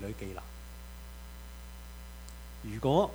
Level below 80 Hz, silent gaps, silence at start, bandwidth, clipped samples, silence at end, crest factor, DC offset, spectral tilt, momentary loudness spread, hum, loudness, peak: -46 dBFS; none; 0 s; over 20 kHz; under 0.1%; 0 s; 22 dB; under 0.1%; -6.5 dB/octave; 17 LU; 60 Hz at -45 dBFS; -39 LUFS; -14 dBFS